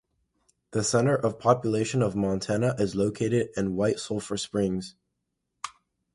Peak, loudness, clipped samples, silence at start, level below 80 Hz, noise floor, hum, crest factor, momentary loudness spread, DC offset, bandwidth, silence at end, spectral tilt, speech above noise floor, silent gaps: -8 dBFS; -27 LUFS; under 0.1%; 0.7 s; -56 dBFS; -80 dBFS; none; 20 dB; 12 LU; under 0.1%; 11.5 kHz; 0.45 s; -5.5 dB/octave; 55 dB; none